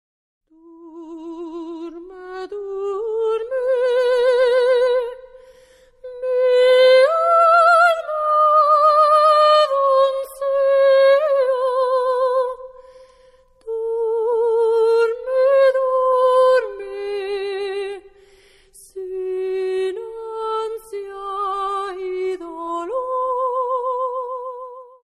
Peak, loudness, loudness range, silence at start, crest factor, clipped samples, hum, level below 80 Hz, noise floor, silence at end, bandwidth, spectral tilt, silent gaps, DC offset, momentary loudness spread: -4 dBFS; -17 LUFS; 13 LU; 0.8 s; 14 dB; under 0.1%; none; -58 dBFS; -52 dBFS; 0.25 s; 12 kHz; -2 dB/octave; none; under 0.1%; 18 LU